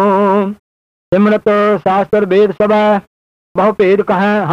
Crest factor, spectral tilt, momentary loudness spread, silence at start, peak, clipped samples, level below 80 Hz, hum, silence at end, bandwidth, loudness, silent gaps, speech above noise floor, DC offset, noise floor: 10 dB; -8 dB/octave; 6 LU; 0 s; -2 dBFS; under 0.1%; -50 dBFS; none; 0 s; 7.2 kHz; -12 LUFS; 0.59-1.12 s, 3.07-3.55 s; over 79 dB; under 0.1%; under -90 dBFS